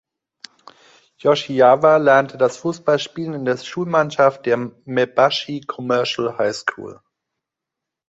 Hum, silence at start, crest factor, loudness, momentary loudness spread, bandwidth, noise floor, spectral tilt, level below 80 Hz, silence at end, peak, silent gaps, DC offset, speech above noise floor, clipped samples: none; 1.25 s; 18 dB; -18 LUFS; 12 LU; 8 kHz; -84 dBFS; -5 dB/octave; -64 dBFS; 1.15 s; -2 dBFS; none; under 0.1%; 66 dB; under 0.1%